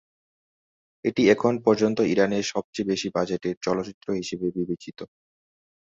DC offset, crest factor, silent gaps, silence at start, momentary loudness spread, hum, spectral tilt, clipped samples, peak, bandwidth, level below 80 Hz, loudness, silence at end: under 0.1%; 22 dB; 2.64-2.73 s, 3.57-3.61 s, 3.94-4.01 s; 1.05 s; 11 LU; none; -5.5 dB/octave; under 0.1%; -4 dBFS; 7.8 kHz; -62 dBFS; -25 LUFS; 0.9 s